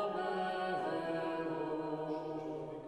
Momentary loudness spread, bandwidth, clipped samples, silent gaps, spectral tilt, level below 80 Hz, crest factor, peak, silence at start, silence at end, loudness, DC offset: 5 LU; 12 kHz; under 0.1%; none; -6.5 dB/octave; -74 dBFS; 12 dB; -26 dBFS; 0 s; 0 s; -38 LUFS; under 0.1%